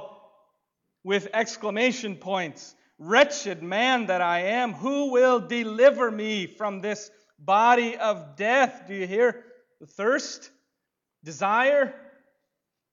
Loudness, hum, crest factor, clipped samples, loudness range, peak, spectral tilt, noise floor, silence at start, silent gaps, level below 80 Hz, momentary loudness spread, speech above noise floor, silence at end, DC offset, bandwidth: -24 LUFS; none; 20 dB; under 0.1%; 5 LU; -6 dBFS; -3.5 dB/octave; -83 dBFS; 0 s; none; -78 dBFS; 13 LU; 59 dB; 0.95 s; under 0.1%; 7.6 kHz